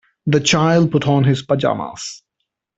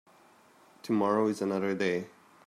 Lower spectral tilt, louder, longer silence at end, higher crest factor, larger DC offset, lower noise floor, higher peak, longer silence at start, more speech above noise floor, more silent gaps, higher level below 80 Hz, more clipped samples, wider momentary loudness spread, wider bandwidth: about the same, -5.5 dB/octave vs -6.5 dB/octave; first, -16 LUFS vs -30 LUFS; first, 0.6 s vs 0.4 s; about the same, 16 dB vs 18 dB; neither; first, -76 dBFS vs -60 dBFS; first, -2 dBFS vs -14 dBFS; second, 0.25 s vs 0.85 s; first, 60 dB vs 31 dB; neither; first, -52 dBFS vs -78 dBFS; neither; about the same, 14 LU vs 14 LU; second, 8 kHz vs 14.5 kHz